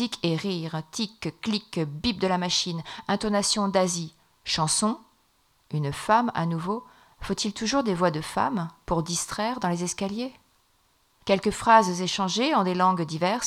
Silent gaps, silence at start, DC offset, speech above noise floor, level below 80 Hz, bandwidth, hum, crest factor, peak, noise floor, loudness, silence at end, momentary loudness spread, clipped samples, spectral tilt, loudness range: none; 0 s; under 0.1%; 40 dB; -54 dBFS; 15 kHz; none; 22 dB; -4 dBFS; -66 dBFS; -26 LUFS; 0 s; 10 LU; under 0.1%; -4 dB/octave; 4 LU